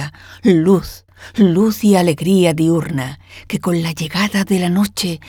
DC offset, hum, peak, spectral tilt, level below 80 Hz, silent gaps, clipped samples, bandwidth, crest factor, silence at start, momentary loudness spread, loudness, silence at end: under 0.1%; none; 0 dBFS; -6 dB/octave; -46 dBFS; none; under 0.1%; 19 kHz; 14 dB; 0 s; 13 LU; -15 LUFS; 0 s